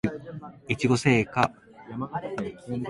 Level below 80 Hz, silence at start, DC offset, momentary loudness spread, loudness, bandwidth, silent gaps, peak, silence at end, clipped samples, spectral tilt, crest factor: -56 dBFS; 0.05 s; under 0.1%; 18 LU; -26 LUFS; 11.5 kHz; none; -4 dBFS; 0 s; under 0.1%; -6 dB/octave; 24 dB